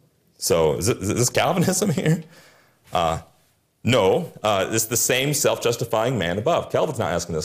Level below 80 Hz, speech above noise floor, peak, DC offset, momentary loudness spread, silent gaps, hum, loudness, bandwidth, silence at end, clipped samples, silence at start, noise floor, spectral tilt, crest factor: -52 dBFS; 41 dB; -8 dBFS; under 0.1%; 6 LU; none; none; -21 LUFS; 15.5 kHz; 0 s; under 0.1%; 0.4 s; -63 dBFS; -4 dB/octave; 14 dB